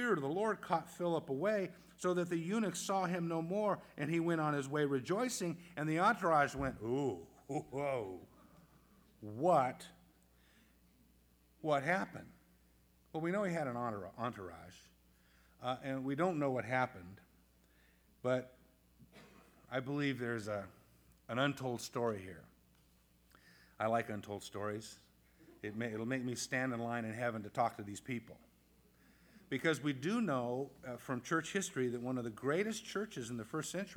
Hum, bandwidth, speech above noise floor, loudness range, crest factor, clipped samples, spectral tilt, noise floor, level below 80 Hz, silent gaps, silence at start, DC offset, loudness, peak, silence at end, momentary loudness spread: none; over 20 kHz; 32 dB; 6 LU; 22 dB; under 0.1%; -5.5 dB/octave; -70 dBFS; -70 dBFS; none; 0 s; under 0.1%; -38 LUFS; -18 dBFS; 0 s; 12 LU